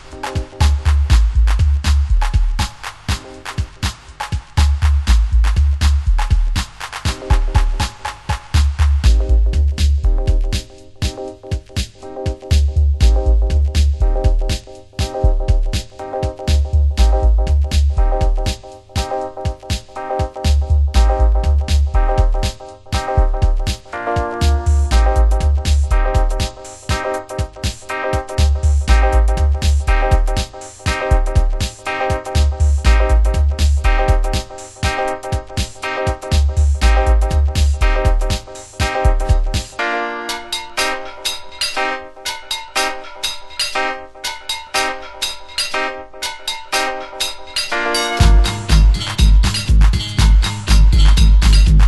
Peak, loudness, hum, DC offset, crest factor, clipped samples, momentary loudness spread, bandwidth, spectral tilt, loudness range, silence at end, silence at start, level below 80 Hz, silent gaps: 0 dBFS; -18 LUFS; none; under 0.1%; 14 dB; under 0.1%; 10 LU; 12.5 kHz; -5 dB/octave; 4 LU; 0 s; 0.05 s; -16 dBFS; none